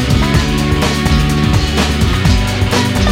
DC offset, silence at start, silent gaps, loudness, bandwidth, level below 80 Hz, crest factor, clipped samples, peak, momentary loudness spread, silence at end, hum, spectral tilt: under 0.1%; 0 s; none; -13 LUFS; 16.5 kHz; -18 dBFS; 12 dB; under 0.1%; 0 dBFS; 1 LU; 0 s; none; -5 dB/octave